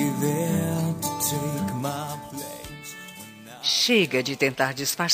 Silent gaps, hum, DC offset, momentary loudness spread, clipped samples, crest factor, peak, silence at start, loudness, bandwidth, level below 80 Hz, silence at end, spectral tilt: none; none; under 0.1%; 18 LU; under 0.1%; 20 dB; -6 dBFS; 0 s; -24 LUFS; 15.5 kHz; -60 dBFS; 0 s; -3.5 dB/octave